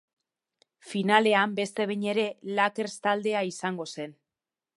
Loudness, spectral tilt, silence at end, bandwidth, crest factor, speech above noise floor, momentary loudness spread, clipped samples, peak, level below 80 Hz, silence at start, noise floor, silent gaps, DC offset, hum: -27 LUFS; -4.5 dB/octave; 0.65 s; 11.5 kHz; 24 dB; over 63 dB; 13 LU; under 0.1%; -4 dBFS; -80 dBFS; 0.85 s; under -90 dBFS; none; under 0.1%; none